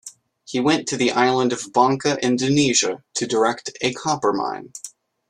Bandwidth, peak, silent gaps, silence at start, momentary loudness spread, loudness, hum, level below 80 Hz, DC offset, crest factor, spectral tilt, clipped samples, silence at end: 12 kHz; -2 dBFS; none; 0.05 s; 12 LU; -20 LUFS; none; -60 dBFS; under 0.1%; 18 dB; -3.5 dB/octave; under 0.1%; 0.4 s